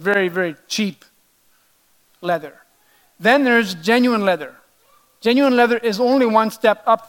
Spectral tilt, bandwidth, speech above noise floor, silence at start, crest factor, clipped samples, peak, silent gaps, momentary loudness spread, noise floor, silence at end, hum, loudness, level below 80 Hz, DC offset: -4.5 dB/octave; 17.5 kHz; 42 dB; 0 s; 18 dB; under 0.1%; 0 dBFS; none; 10 LU; -59 dBFS; 0.05 s; none; -17 LUFS; -70 dBFS; under 0.1%